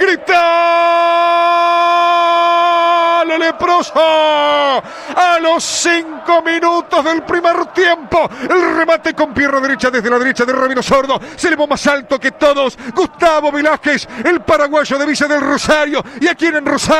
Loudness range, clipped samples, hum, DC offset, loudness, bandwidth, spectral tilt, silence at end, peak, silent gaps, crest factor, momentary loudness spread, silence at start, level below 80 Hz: 3 LU; under 0.1%; none; under 0.1%; -12 LUFS; 13 kHz; -3 dB/octave; 0 s; -2 dBFS; none; 10 dB; 4 LU; 0 s; -46 dBFS